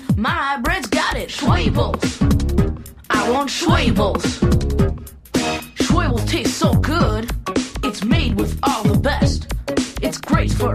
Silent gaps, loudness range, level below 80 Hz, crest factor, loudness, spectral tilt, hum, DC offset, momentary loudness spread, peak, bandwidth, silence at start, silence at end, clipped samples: none; 1 LU; -26 dBFS; 16 dB; -19 LUFS; -5.5 dB/octave; none; under 0.1%; 6 LU; -2 dBFS; 15.5 kHz; 0 s; 0 s; under 0.1%